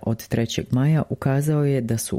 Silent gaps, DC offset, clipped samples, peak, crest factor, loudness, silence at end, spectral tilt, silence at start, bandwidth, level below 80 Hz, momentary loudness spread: none; under 0.1%; under 0.1%; -8 dBFS; 14 dB; -22 LUFS; 0 s; -6.5 dB/octave; 0.05 s; 16 kHz; -48 dBFS; 4 LU